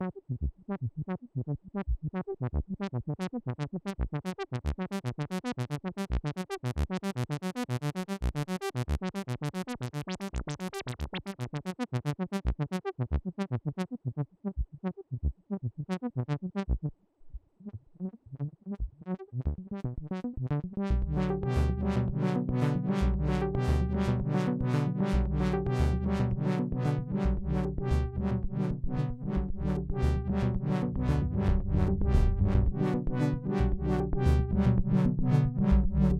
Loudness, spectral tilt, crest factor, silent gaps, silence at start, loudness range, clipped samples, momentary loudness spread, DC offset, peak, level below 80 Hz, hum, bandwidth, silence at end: -32 LUFS; -8 dB/octave; 18 dB; none; 0 s; 8 LU; under 0.1%; 10 LU; under 0.1%; -12 dBFS; -36 dBFS; none; 13 kHz; 0 s